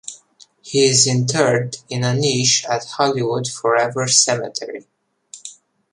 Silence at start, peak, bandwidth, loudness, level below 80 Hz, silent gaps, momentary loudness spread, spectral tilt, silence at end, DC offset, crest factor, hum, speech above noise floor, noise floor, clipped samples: 0.05 s; 0 dBFS; 11.5 kHz; -17 LUFS; -60 dBFS; none; 21 LU; -3 dB/octave; 0.4 s; under 0.1%; 20 dB; none; 32 dB; -50 dBFS; under 0.1%